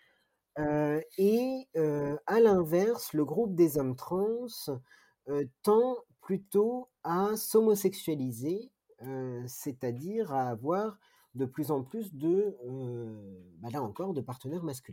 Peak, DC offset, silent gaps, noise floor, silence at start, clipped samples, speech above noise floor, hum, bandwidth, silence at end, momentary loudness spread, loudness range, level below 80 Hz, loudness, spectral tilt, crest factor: -14 dBFS; under 0.1%; none; -72 dBFS; 0.55 s; under 0.1%; 42 dB; none; 17 kHz; 0 s; 13 LU; 7 LU; -66 dBFS; -31 LUFS; -6.5 dB/octave; 18 dB